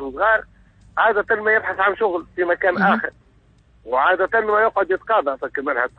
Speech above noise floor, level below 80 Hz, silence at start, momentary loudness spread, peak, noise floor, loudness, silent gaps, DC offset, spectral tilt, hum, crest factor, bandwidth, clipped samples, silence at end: 35 dB; -54 dBFS; 0 s; 7 LU; -4 dBFS; -54 dBFS; -19 LUFS; none; under 0.1%; -7.5 dB/octave; none; 16 dB; 5.8 kHz; under 0.1%; 0.1 s